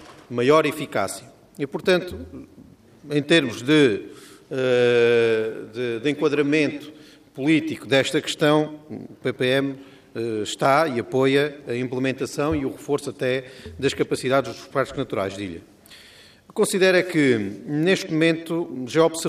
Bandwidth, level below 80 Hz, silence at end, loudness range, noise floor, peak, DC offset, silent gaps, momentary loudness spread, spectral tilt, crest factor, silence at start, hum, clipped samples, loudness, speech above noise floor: 15.5 kHz; -58 dBFS; 0 s; 4 LU; -49 dBFS; -4 dBFS; under 0.1%; none; 15 LU; -5 dB/octave; 18 dB; 0 s; none; under 0.1%; -22 LUFS; 27 dB